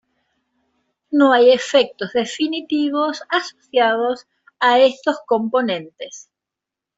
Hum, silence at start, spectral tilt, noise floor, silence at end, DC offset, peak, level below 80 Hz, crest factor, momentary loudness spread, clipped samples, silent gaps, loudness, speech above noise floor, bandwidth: none; 1.1 s; -3.5 dB/octave; -85 dBFS; 0.75 s; under 0.1%; -2 dBFS; -68 dBFS; 16 dB; 11 LU; under 0.1%; none; -18 LUFS; 68 dB; 7.8 kHz